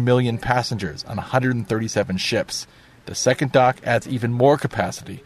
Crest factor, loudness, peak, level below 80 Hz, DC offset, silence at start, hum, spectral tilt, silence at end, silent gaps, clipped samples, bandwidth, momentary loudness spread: 20 dB; -21 LUFS; -2 dBFS; -48 dBFS; under 0.1%; 0 s; none; -5 dB/octave; 0.05 s; none; under 0.1%; 13.5 kHz; 11 LU